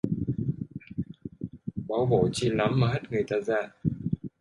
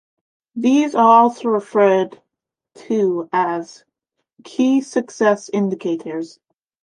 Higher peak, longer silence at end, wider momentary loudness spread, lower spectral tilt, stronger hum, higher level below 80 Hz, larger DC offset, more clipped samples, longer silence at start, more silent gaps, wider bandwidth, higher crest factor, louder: second, -10 dBFS vs -2 dBFS; second, 0.15 s vs 0.55 s; second, 13 LU vs 16 LU; about the same, -7 dB/octave vs -6 dB/octave; neither; first, -52 dBFS vs -74 dBFS; neither; neither; second, 0.05 s vs 0.55 s; neither; about the same, 11.5 kHz vs 10.5 kHz; about the same, 20 dB vs 16 dB; second, -29 LUFS vs -17 LUFS